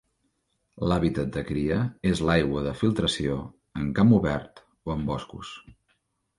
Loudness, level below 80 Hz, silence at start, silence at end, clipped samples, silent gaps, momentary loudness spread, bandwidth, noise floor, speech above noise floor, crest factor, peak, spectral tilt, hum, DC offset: -26 LUFS; -44 dBFS; 0.75 s; 0.65 s; under 0.1%; none; 17 LU; 11.5 kHz; -74 dBFS; 49 dB; 20 dB; -6 dBFS; -6.5 dB/octave; none; under 0.1%